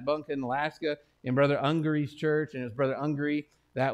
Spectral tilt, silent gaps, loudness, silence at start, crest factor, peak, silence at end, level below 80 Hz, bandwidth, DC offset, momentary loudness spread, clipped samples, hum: -8 dB/octave; none; -30 LUFS; 0 s; 16 dB; -12 dBFS; 0 s; -66 dBFS; 8.8 kHz; under 0.1%; 9 LU; under 0.1%; none